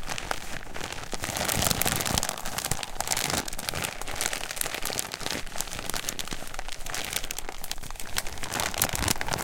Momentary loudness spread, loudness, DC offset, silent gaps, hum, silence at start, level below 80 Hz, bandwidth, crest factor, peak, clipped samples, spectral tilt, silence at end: 11 LU; -30 LUFS; under 0.1%; none; none; 0 s; -40 dBFS; 17 kHz; 28 dB; -2 dBFS; under 0.1%; -2 dB/octave; 0 s